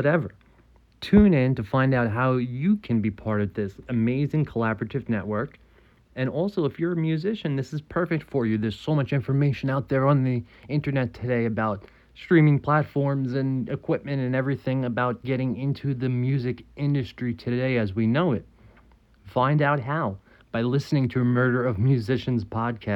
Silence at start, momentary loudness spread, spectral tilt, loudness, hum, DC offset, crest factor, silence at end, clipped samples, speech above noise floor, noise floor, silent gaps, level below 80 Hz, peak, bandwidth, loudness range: 0 s; 8 LU; -9 dB/octave; -25 LUFS; none; under 0.1%; 20 dB; 0 s; under 0.1%; 33 dB; -57 dBFS; none; -48 dBFS; -4 dBFS; 7.4 kHz; 4 LU